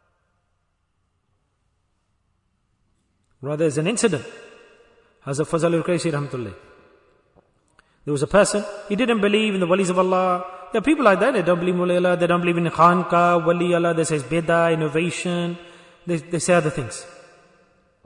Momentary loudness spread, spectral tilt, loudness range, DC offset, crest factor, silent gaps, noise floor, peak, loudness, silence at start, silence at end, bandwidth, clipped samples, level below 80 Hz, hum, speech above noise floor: 13 LU; -5.5 dB/octave; 8 LU; under 0.1%; 18 dB; none; -70 dBFS; -4 dBFS; -20 LUFS; 3.4 s; 0.9 s; 11 kHz; under 0.1%; -54 dBFS; none; 50 dB